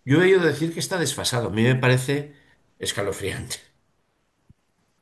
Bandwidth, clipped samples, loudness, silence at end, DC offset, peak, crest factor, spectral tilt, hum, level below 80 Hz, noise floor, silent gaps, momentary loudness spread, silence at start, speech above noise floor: 12.5 kHz; under 0.1%; -22 LUFS; 1.45 s; under 0.1%; -6 dBFS; 18 dB; -5 dB/octave; none; -52 dBFS; -70 dBFS; none; 14 LU; 0.05 s; 48 dB